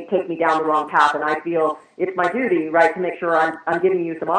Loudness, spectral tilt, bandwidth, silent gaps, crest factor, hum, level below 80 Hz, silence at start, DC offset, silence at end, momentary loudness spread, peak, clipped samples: -19 LUFS; -6 dB/octave; 9.8 kHz; none; 18 dB; none; -68 dBFS; 0 s; under 0.1%; 0 s; 7 LU; -2 dBFS; under 0.1%